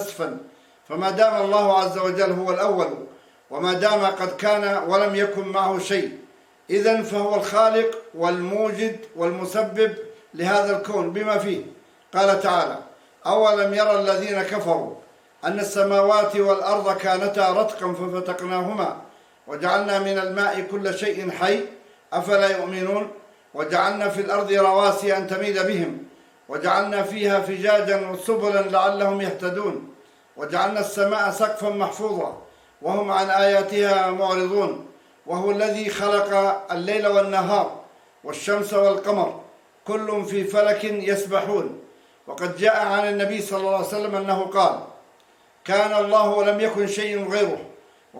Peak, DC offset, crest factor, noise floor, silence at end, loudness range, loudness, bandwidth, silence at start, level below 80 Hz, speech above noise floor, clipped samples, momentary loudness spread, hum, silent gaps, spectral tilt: -4 dBFS; under 0.1%; 18 dB; -56 dBFS; 0 s; 3 LU; -22 LUFS; 16.5 kHz; 0 s; -74 dBFS; 35 dB; under 0.1%; 11 LU; none; none; -4.5 dB/octave